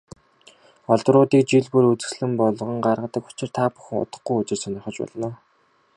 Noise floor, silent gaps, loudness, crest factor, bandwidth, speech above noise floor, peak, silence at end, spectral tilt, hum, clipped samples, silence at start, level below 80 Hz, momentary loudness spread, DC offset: -62 dBFS; none; -22 LUFS; 20 dB; 11 kHz; 41 dB; -2 dBFS; 0.6 s; -6.5 dB/octave; none; under 0.1%; 0.9 s; -62 dBFS; 14 LU; under 0.1%